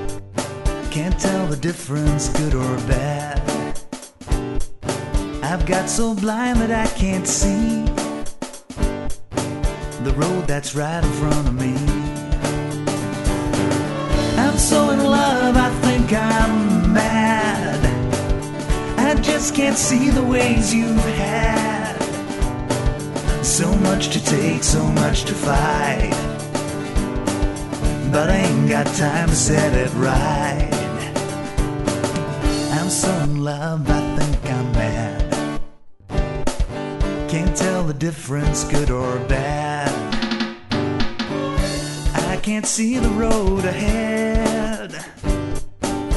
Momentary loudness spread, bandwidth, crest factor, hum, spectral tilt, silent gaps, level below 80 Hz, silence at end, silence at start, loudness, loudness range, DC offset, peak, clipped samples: 9 LU; 12 kHz; 18 dB; none; -5 dB/octave; none; -26 dBFS; 0 s; 0 s; -20 LUFS; 5 LU; under 0.1%; 0 dBFS; under 0.1%